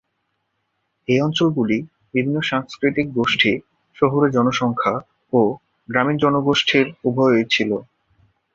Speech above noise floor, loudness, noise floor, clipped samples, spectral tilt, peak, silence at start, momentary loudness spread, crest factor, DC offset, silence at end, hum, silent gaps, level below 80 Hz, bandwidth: 54 dB; -19 LUFS; -72 dBFS; under 0.1%; -5.5 dB/octave; -2 dBFS; 1.1 s; 7 LU; 18 dB; under 0.1%; 0.7 s; none; none; -58 dBFS; 7.6 kHz